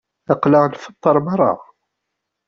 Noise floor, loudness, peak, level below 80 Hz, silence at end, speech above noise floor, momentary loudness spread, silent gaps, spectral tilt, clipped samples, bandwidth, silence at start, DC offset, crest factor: -78 dBFS; -17 LUFS; -2 dBFS; -60 dBFS; 0.85 s; 62 dB; 7 LU; none; -7.5 dB/octave; under 0.1%; 7 kHz; 0.3 s; under 0.1%; 16 dB